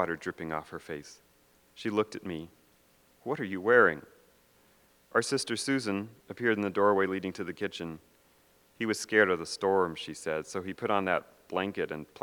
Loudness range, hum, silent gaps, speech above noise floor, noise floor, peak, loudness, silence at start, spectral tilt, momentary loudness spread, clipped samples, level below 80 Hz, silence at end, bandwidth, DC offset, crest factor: 2 LU; none; none; 34 dB; -65 dBFS; -8 dBFS; -30 LUFS; 0 s; -4.5 dB/octave; 16 LU; under 0.1%; -70 dBFS; 0.2 s; 19 kHz; under 0.1%; 24 dB